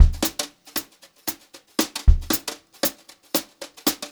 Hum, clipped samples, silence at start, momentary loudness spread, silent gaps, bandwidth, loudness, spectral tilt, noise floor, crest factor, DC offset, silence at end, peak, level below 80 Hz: none; under 0.1%; 0 s; 11 LU; none; over 20 kHz; -25 LUFS; -4 dB/octave; -38 dBFS; 22 dB; under 0.1%; 0.05 s; 0 dBFS; -26 dBFS